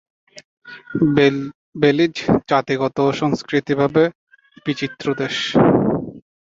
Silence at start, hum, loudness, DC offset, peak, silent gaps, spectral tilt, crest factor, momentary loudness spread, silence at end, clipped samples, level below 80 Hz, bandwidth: 0.65 s; none; -18 LUFS; under 0.1%; -2 dBFS; 1.55-1.73 s, 4.15-4.27 s; -6.5 dB/octave; 18 dB; 11 LU; 0.4 s; under 0.1%; -50 dBFS; 7.8 kHz